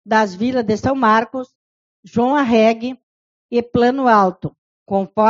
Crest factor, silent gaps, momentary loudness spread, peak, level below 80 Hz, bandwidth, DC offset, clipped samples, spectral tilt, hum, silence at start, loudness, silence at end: 18 dB; 1.55-2.03 s, 3.03-3.49 s, 4.58-4.86 s; 16 LU; 0 dBFS; -52 dBFS; 7.6 kHz; under 0.1%; under 0.1%; -4.5 dB/octave; none; 0.05 s; -17 LUFS; 0 s